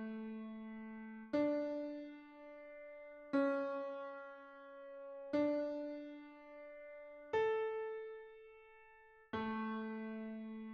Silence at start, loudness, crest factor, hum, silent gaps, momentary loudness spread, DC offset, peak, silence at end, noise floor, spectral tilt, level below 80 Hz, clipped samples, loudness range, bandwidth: 0 s; -42 LUFS; 18 dB; none; none; 18 LU; under 0.1%; -24 dBFS; 0 s; -64 dBFS; -7 dB/octave; -78 dBFS; under 0.1%; 3 LU; 6.6 kHz